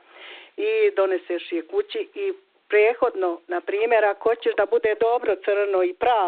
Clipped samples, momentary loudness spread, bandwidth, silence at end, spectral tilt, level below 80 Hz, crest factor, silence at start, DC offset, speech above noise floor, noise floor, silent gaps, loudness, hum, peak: under 0.1%; 10 LU; 4.5 kHz; 0 s; -0.5 dB/octave; -64 dBFS; 16 dB; 0.2 s; under 0.1%; 22 dB; -44 dBFS; none; -23 LUFS; none; -8 dBFS